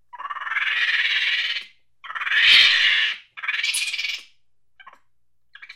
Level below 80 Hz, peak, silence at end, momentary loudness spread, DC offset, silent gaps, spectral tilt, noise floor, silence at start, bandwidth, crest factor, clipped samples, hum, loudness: -66 dBFS; -2 dBFS; 0.05 s; 18 LU; 0.1%; none; 3.5 dB/octave; -77 dBFS; 0.15 s; 16.5 kHz; 20 dB; under 0.1%; none; -18 LUFS